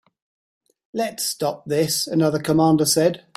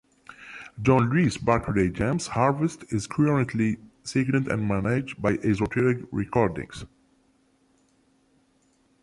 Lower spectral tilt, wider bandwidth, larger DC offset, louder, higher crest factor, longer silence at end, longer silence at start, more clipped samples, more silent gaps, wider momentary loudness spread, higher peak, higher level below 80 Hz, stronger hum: second, -4.5 dB/octave vs -7 dB/octave; first, 16 kHz vs 11.5 kHz; neither; first, -20 LUFS vs -25 LUFS; about the same, 16 dB vs 20 dB; second, 0.2 s vs 2.15 s; first, 0.95 s vs 0.3 s; neither; neither; about the same, 10 LU vs 12 LU; about the same, -6 dBFS vs -6 dBFS; second, -60 dBFS vs -48 dBFS; neither